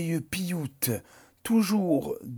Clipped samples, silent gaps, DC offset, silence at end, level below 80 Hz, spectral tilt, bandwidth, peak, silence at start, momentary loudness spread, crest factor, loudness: under 0.1%; none; under 0.1%; 0 s; -60 dBFS; -5.5 dB/octave; over 20 kHz; -12 dBFS; 0 s; 9 LU; 16 dB; -28 LUFS